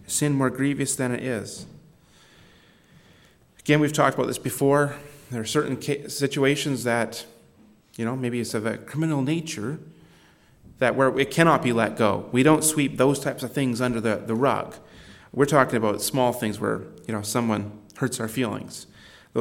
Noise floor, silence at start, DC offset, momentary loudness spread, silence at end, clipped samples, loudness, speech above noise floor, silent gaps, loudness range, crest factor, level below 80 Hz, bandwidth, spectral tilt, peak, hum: -56 dBFS; 0.1 s; under 0.1%; 13 LU; 0 s; under 0.1%; -24 LUFS; 32 dB; none; 7 LU; 22 dB; -60 dBFS; 17 kHz; -5 dB/octave; -2 dBFS; none